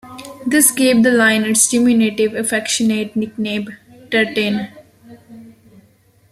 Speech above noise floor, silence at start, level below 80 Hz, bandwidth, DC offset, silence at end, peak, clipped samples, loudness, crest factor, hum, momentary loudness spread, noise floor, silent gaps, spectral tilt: 38 dB; 0.05 s; -58 dBFS; 15 kHz; under 0.1%; 0.8 s; 0 dBFS; under 0.1%; -15 LUFS; 18 dB; none; 13 LU; -53 dBFS; none; -3 dB/octave